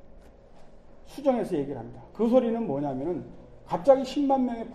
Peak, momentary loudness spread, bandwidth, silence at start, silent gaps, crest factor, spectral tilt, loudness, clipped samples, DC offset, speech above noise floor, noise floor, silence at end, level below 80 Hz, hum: -6 dBFS; 16 LU; 11 kHz; 0.05 s; none; 22 dB; -7.5 dB/octave; -26 LUFS; under 0.1%; under 0.1%; 23 dB; -49 dBFS; 0 s; -52 dBFS; none